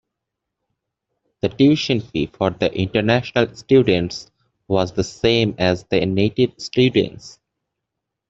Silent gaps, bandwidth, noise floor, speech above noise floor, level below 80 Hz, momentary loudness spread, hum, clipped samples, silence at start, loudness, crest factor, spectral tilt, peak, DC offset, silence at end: none; 8 kHz; -81 dBFS; 63 dB; -50 dBFS; 8 LU; none; under 0.1%; 1.45 s; -19 LUFS; 18 dB; -6 dB/octave; -2 dBFS; under 0.1%; 1 s